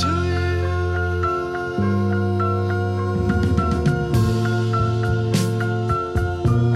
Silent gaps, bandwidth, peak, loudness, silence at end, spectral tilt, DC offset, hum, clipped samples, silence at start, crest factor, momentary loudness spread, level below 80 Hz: none; 13.5 kHz; -6 dBFS; -21 LUFS; 0 s; -7 dB/octave; under 0.1%; none; under 0.1%; 0 s; 14 dB; 3 LU; -34 dBFS